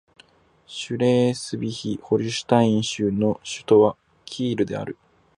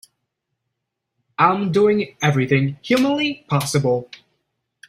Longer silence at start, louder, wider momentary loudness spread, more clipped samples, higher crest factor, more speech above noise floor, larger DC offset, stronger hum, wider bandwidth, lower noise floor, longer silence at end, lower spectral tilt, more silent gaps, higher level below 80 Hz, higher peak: second, 0.7 s vs 1.4 s; second, -22 LUFS vs -19 LUFS; first, 17 LU vs 5 LU; neither; about the same, 20 dB vs 18 dB; second, 34 dB vs 61 dB; neither; neither; second, 11.5 kHz vs 15.5 kHz; second, -56 dBFS vs -79 dBFS; second, 0.45 s vs 0.85 s; about the same, -6 dB/octave vs -5.5 dB/octave; neither; about the same, -58 dBFS vs -58 dBFS; about the same, -2 dBFS vs -2 dBFS